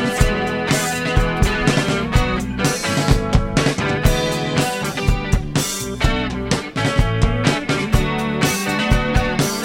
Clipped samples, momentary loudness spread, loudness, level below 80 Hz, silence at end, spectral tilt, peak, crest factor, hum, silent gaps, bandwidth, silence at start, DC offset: under 0.1%; 3 LU; -19 LUFS; -24 dBFS; 0 s; -4.5 dB/octave; 0 dBFS; 16 dB; none; none; 16.5 kHz; 0 s; under 0.1%